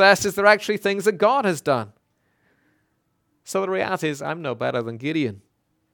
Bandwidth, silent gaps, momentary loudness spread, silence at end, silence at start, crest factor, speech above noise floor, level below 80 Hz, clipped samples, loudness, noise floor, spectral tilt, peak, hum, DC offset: 19 kHz; none; 11 LU; 0.55 s; 0 s; 22 dB; 49 dB; -64 dBFS; under 0.1%; -22 LUFS; -70 dBFS; -4 dB/octave; -2 dBFS; none; under 0.1%